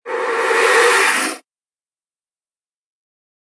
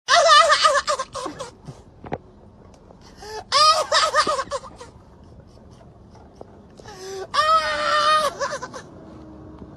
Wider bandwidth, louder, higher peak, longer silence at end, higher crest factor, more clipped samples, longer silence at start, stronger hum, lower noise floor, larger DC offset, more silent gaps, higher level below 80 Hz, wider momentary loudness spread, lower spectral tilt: second, 11 kHz vs 13 kHz; first, -14 LUFS vs -18 LUFS; about the same, 0 dBFS vs -2 dBFS; first, 2.2 s vs 0 s; about the same, 18 dB vs 22 dB; neither; about the same, 0.05 s vs 0.1 s; neither; first, under -90 dBFS vs -47 dBFS; neither; neither; second, -82 dBFS vs -52 dBFS; second, 11 LU vs 24 LU; second, 0.5 dB/octave vs -1 dB/octave